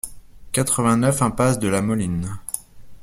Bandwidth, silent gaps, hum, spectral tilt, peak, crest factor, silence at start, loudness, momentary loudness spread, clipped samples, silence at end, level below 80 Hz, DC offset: 16.5 kHz; none; none; -5 dB/octave; -4 dBFS; 18 dB; 0.05 s; -21 LUFS; 12 LU; under 0.1%; 0 s; -44 dBFS; under 0.1%